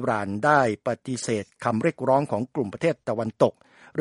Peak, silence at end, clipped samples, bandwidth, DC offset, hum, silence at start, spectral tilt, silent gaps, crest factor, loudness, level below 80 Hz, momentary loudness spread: -4 dBFS; 0 s; under 0.1%; 11.5 kHz; under 0.1%; none; 0 s; -6 dB/octave; none; 20 dB; -25 LUFS; -66 dBFS; 8 LU